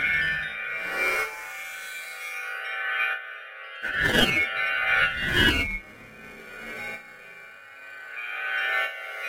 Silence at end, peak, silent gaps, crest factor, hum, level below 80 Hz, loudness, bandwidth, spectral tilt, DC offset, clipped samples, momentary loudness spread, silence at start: 0 s; -6 dBFS; none; 22 dB; none; -46 dBFS; -25 LUFS; 16 kHz; -3 dB/octave; under 0.1%; under 0.1%; 22 LU; 0 s